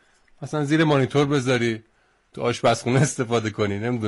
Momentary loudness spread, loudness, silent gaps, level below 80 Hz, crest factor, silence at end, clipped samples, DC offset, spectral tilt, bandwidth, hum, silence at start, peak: 9 LU; -22 LUFS; none; -58 dBFS; 14 dB; 0 s; under 0.1%; under 0.1%; -5.5 dB/octave; 11.5 kHz; none; 0.4 s; -8 dBFS